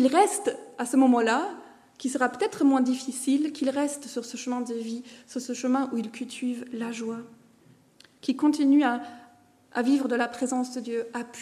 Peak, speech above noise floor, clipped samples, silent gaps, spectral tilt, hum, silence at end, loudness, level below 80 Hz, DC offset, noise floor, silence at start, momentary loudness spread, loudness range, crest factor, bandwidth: -8 dBFS; 32 dB; under 0.1%; none; -3.5 dB/octave; none; 0 s; -27 LUFS; -78 dBFS; under 0.1%; -58 dBFS; 0 s; 14 LU; 7 LU; 18 dB; 13.5 kHz